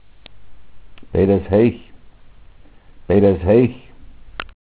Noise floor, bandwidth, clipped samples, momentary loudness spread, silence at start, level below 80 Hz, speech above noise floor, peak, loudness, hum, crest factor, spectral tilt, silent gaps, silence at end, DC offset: -43 dBFS; 4 kHz; under 0.1%; 19 LU; 0.35 s; -36 dBFS; 28 dB; -2 dBFS; -16 LUFS; none; 18 dB; -12.5 dB/octave; none; 0.3 s; under 0.1%